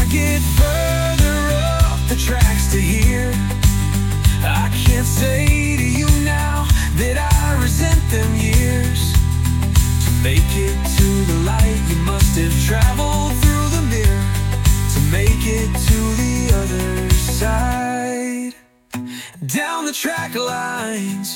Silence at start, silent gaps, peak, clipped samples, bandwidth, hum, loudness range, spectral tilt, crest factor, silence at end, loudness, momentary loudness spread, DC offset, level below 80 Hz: 0 s; none; 0 dBFS; under 0.1%; 17 kHz; none; 4 LU; -5 dB/octave; 14 dB; 0 s; -17 LUFS; 6 LU; under 0.1%; -20 dBFS